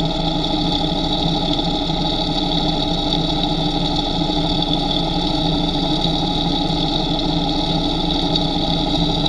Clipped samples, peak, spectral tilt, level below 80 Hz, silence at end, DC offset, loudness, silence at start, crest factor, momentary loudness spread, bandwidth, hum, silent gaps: under 0.1%; -2 dBFS; -6 dB/octave; -28 dBFS; 0 s; under 0.1%; -18 LUFS; 0 s; 16 dB; 1 LU; 11.5 kHz; none; none